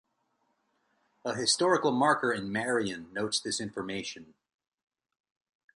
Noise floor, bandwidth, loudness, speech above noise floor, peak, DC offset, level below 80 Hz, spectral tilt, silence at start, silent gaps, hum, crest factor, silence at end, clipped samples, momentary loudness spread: -76 dBFS; 11.5 kHz; -29 LUFS; 46 dB; -10 dBFS; under 0.1%; -70 dBFS; -3 dB/octave; 1.25 s; none; none; 22 dB; 1.5 s; under 0.1%; 12 LU